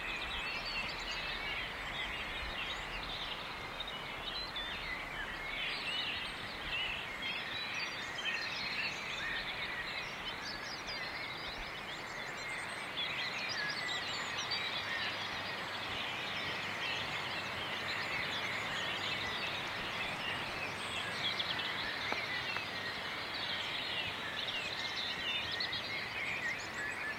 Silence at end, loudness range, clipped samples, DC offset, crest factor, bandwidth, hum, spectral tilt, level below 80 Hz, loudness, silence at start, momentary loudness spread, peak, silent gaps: 0 s; 3 LU; under 0.1%; under 0.1%; 22 dB; 16 kHz; none; -2 dB/octave; -60 dBFS; -37 LUFS; 0 s; 5 LU; -18 dBFS; none